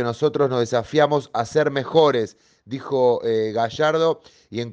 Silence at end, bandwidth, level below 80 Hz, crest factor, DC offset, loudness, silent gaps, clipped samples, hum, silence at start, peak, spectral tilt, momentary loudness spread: 0 s; 8.4 kHz; -62 dBFS; 18 dB; under 0.1%; -20 LUFS; none; under 0.1%; none; 0 s; -4 dBFS; -6 dB/octave; 13 LU